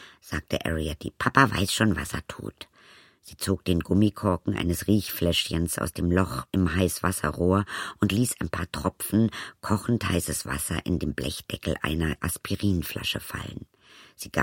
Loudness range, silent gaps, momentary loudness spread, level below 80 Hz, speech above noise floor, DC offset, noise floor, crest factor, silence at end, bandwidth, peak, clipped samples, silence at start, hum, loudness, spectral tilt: 3 LU; none; 11 LU; -42 dBFS; 28 dB; under 0.1%; -55 dBFS; 24 dB; 0 s; 16.5 kHz; -2 dBFS; under 0.1%; 0 s; none; -27 LUFS; -5 dB/octave